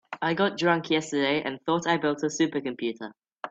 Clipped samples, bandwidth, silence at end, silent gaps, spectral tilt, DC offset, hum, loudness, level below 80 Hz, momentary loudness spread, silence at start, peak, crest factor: under 0.1%; 8 kHz; 0 s; none; -4.5 dB/octave; under 0.1%; none; -26 LUFS; -70 dBFS; 9 LU; 0.1 s; -8 dBFS; 18 dB